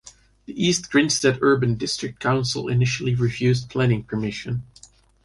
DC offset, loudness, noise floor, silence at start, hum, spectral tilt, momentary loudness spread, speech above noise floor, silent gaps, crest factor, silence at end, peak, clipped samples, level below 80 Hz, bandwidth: under 0.1%; -22 LUFS; -52 dBFS; 0.05 s; none; -5 dB/octave; 9 LU; 30 dB; none; 16 dB; 0.65 s; -6 dBFS; under 0.1%; -50 dBFS; 11.5 kHz